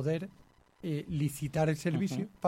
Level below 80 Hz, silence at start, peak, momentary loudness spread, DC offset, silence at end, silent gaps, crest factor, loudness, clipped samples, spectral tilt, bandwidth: -60 dBFS; 0 s; -16 dBFS; 8 LU; under 0.1%; 0 s; none; 18 dB; -34 LUFS; under 0.1%; -7 dB/octave; 16.5 kHz